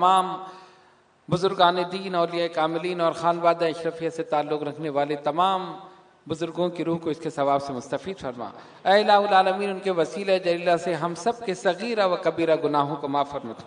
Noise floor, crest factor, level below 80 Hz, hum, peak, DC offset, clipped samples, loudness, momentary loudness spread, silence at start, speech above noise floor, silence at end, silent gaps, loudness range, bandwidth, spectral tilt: -58 dBFS; 20 dB; -68 dBFS; none; -4 dBFS; under 0.1%; under 0.1%; -24 LUFS; 11 LU; 0 s; 34 dB; 0 s; none; 5 LU; 11 kHz; -5.5 dB/octave